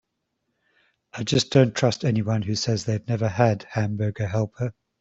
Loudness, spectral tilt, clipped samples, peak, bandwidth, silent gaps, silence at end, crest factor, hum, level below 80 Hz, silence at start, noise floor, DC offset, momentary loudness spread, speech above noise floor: -24 LUFS; -6 dB/octave; under 0.1%; -4 dBFS; 8 kHz; none; 0.3 s; 20 dB; none; -56 dBFS; 1.15 s; -77 dBFS; under 0.1%; 10 LU; 54 dB